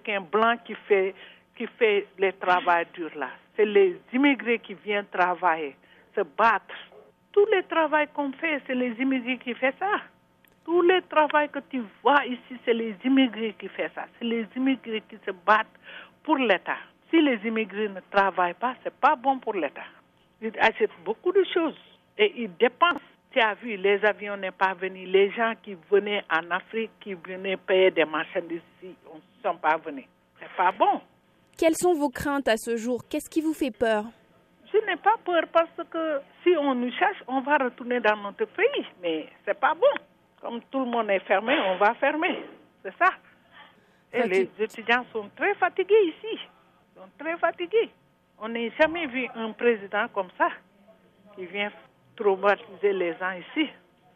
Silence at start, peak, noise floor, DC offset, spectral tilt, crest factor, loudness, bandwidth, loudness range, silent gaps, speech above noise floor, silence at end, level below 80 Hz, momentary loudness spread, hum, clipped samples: 0.05 s; -6 dBFS; -61 dBFS; under 0.1%; -4.5 dB/octave; 20 dB; -25 LUFS; 14 kHz; 3 LU; none; 36 dB; 0.45 s; -68 dBFS; 12 LU; none; under 0.1%